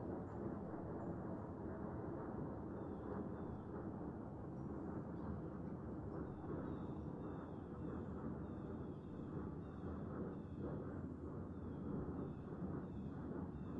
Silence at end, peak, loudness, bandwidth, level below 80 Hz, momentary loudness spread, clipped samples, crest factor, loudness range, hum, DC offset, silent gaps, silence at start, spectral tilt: 0 s; -34 dBFS; -49 LUFS; 7.6 kHz; -62 dBFS; 2 LU; under 0.1%; 14 dB; 1 LU; none; under 0.1%; none; 0 s; -10.5 dB/octave